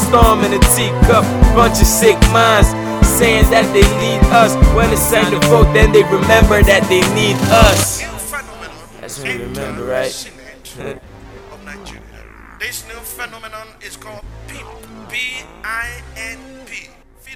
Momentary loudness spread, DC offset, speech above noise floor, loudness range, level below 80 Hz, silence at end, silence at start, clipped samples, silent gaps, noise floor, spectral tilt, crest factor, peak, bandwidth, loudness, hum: 22 LU; under 0.1%; 25 dB; 18 LU; -20 dBFS; 0 s; 0 s; 0.3%; none; -37 dBFS; -4.5 dB/octave; 14 dB; 0 dBFS; over 20 kHz; -12 LUFS; none